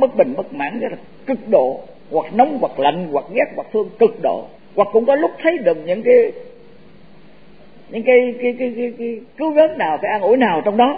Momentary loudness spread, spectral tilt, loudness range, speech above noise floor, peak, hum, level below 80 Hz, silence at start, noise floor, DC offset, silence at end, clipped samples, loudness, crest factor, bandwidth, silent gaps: 12 LU; -9.5 dB/octave; 2 LU; 30 dB; 0 dBFS; none; -60 dBFS; 0 s; -46 dBFS; 0.7%; 0 s; under 0.1%; -17 LUFS; 16 dB; 4.9 kHz; none